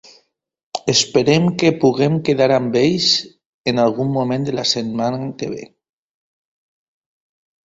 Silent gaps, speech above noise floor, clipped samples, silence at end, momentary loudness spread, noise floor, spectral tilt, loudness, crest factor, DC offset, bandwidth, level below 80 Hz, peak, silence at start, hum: 3.46-3.64 s; 49 dB; under 0.1%; 2 s; 11 LU; -66 dBFS; -4.5 dB/octave; -17 LUFS; 18 dB; under 0.1%; 8.2 kHz; -56 dBFS; 0 dBFS; 0.75 s; none